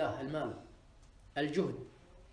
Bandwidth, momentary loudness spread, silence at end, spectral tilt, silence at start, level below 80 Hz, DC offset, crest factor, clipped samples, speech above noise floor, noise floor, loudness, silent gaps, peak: 10.5 kHz; 18 LU; 0 s; -6.5 dB/octave; 0 s; -62 dBFS; under 0.1%; 18 dB; under 0.1%; 23 dB; -60 dBFS; -38 LUFS; none; -20 dBFS